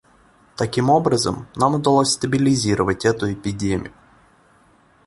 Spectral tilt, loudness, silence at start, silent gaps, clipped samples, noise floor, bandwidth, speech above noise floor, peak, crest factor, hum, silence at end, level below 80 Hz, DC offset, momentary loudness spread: -5 dB/octave; -19 LUFS; 0.6 s; none; under 0.1%; -55 dBFS; 11.5 kHz; 36 dB; -2 dBFS; 18 dB; none; 1.15 s; -46 dBFS; under 0.1%; 9 LU